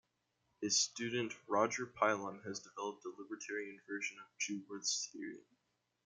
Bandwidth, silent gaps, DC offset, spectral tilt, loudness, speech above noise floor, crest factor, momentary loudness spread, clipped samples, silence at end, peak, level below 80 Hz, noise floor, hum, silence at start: 11 kHz; none; under 0.1%; -2 dB/octave; -39 LUFS; 42 dB; 24 dB; 14 LU; under 0.1%; 0.65 s; -18 dBFS; -84 dBFS; -83 dBFS; none; 0.6 s